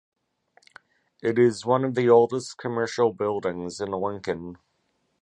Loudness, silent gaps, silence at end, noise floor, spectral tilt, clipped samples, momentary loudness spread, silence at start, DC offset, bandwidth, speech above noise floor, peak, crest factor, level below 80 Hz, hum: -24 LUFS; none; 0.65 s; -72 dBFS; -6 dB/octave; under 0.1%; 13 LU; 1.25 s; under 0.1%; 10 kHz; 49 dB; -6 dBFS; 20 dB; -62 dBFS; none